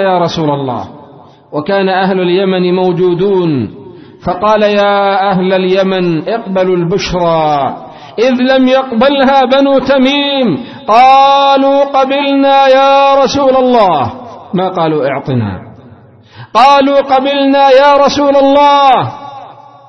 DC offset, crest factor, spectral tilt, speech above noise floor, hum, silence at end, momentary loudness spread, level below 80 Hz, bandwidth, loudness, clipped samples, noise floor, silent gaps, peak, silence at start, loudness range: under 0.1%; 10 dB; -6 dB/octave; 29 dB; none; 0.35 s; 12 LU; -42 dBFS; 6.4 kHz; -9 LUFS; 0.3%; -38 dBFS; none; 0 dBFS; 0 s; 5 LU